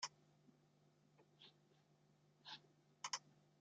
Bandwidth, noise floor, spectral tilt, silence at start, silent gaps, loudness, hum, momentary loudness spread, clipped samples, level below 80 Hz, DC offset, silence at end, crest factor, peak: 7.6 kHz; -76 dBFS; 0.5 dB/octave; 0 s; none; -53 LUFS; 50 Hz at -80 dBFS; 18 LU; under 0.1%; under -90 dBFS; under 0.1%; 0.2 s; 30 dB; -30 dBFS